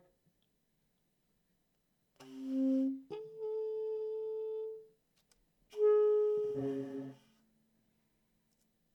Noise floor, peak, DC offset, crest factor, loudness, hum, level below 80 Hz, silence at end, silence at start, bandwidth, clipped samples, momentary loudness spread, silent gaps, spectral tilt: -79 dBFS; -22 dBFS; under 0.1%; 16 dB; -35 LUFS; none; -84 dBFS; 1.8 s; 2.2 s; 6.2 kHz; under 0.1%; 18 LU; none; -8.5 dB/octave